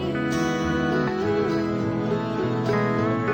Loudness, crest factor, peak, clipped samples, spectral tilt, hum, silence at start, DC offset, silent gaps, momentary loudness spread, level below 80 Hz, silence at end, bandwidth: -24 LUFS; 12 dB; -10 dBFS; under 0.1%; -7 dB/octave; none; 0 s; under 0.1%; none; 2 LU; -46 dBFS; 0 s; 18 kHz